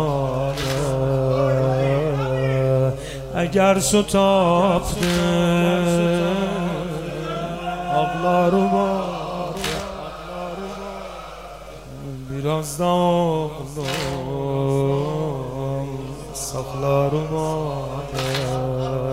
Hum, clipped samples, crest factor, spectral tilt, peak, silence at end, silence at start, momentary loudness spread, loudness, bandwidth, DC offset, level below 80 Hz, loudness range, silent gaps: none; under 0.1%; 18 dB; -5.5 dB/octave; -4 dBFS; 0 s; 0 s; 14 LU; -21 LUFS; 16 kHz; 0.2%; -40 dBFS; 7 LU; none